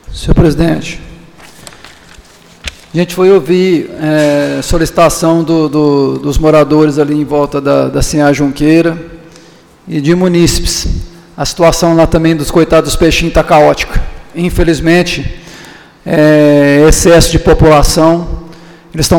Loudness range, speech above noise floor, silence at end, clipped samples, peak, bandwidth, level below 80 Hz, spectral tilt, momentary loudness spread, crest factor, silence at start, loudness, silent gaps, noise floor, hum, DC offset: 5 LU; 31 dB; 0 s; 0.3%; 0 dBFS; 19 kHz; -20 dBFS; -5.5 dB/octave; 14 LU; 10 dB; 0.1 s; -9 LUFS; none; -39 dBFS; none; under 0.1%